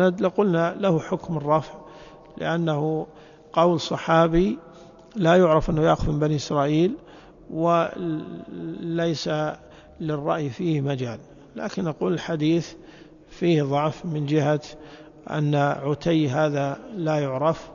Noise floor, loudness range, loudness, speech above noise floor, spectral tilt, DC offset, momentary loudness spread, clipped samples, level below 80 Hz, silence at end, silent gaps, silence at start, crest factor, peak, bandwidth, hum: -47 dBFS; 6 LU; -23 LUFS; 24 dB; -7 dB/octave; under 0.1%; 15 LU; under 0.1%; -46 dBFS; 0 s; none; 0 s; 18 dB; -6 dBFS; 7.4 kHz; none